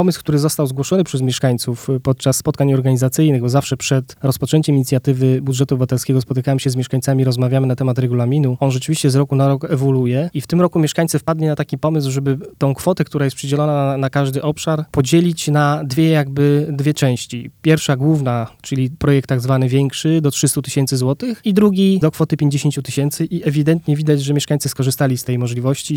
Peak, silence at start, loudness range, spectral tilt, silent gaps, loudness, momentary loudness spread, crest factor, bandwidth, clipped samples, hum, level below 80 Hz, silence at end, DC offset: 0 dBFS; 0 s; 2 LU; -6 dB/octave; none; -17 LUFS; 5 LU; 16 dB; 17 kHz; under 0.1%; none; -48 dBFS; 0 s; under 0.1%